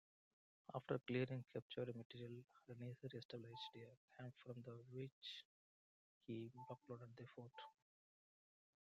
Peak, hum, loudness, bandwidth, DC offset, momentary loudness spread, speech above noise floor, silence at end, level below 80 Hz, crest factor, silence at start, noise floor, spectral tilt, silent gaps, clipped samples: -30 dBFS; none; -53 LUFS; 7.8 kHz; under 0.1%; 14 LU; over 37 dB; 1.2 s; -90 dBFS; 24 dB; 0.7 s; under -90 dBFS; -7.5 dB/octave; 1.62-1.70 s, 2.05-2.10 s, 3.25-3.29 s, 3.97-4.08 s, 5.12-5.22 s, 5.45-6.21 s; under 0.1%